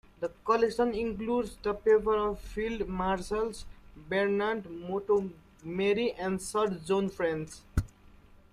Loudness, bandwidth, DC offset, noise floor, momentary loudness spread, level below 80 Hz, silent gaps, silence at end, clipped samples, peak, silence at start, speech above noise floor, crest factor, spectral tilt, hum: -31 LUFS; 14 kHz; under 0.1%; -56 dBFS; 10 LU; -48 dBFS; none; 0.65 s; under 0.1%; -14 dBFS; 0.2 s; 26 dB; 18 dB; -5.5 dB/octave; none